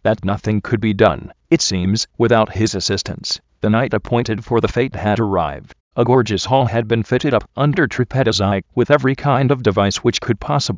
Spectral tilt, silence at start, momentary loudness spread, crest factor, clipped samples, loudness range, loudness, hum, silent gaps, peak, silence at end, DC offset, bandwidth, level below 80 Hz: -5.5 dB/octave; 0.05 s; 6 LU; 16 dB; under 0.1%; 2 LU; -17 LUFS; none; 5.80-5.91 s; 0 dBFS; 0 s; under 0.1%; 7.6 kHz; -38 dBFS